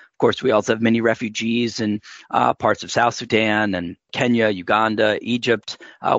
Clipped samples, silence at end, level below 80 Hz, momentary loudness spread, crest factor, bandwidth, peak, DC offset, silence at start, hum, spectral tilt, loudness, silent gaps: under 0.1%; 0 s; -60 dBFS; 7 LU; 16 dB; 8 kHz; -4 dBFS; under 0.1%; 0.2 s; none; -5 dB/octave; -20 LUFS; none